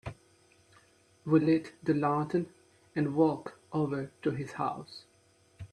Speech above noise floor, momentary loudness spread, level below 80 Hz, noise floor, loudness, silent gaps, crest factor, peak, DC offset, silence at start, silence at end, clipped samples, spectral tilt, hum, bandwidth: 36 dB; 18 LU; -66 dBFS; -65 dBFS; -31 LUFS; none; 20 dB; -12 dBFS; under 0.1%; 0.05 s; 0.05 s; under 0.1%; -8 dB/octave; none; 10.5 kHz